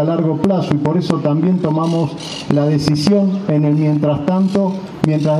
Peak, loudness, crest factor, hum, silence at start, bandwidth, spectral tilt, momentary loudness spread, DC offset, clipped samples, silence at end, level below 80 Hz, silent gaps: 0 dBFS; -16 LUFS; 14 dB; none; 0 s; 11.5 kHz; -7.5 dB/octave; 4 LU; under 0.1%; under 0.1%; 0 s; -50 dBFS; none